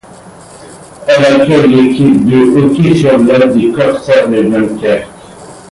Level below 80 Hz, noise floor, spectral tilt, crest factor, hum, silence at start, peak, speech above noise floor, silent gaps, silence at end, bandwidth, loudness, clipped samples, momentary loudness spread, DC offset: -42 dBFS; -33 dBFS; -7 dB/octave; 8 dB; none; 0.25 s; 0 dBFS; 26 dB; none; 0.15 s; 11.5 kHz; -8 LUFS; under 0.1%; 6 LU; under 0.1%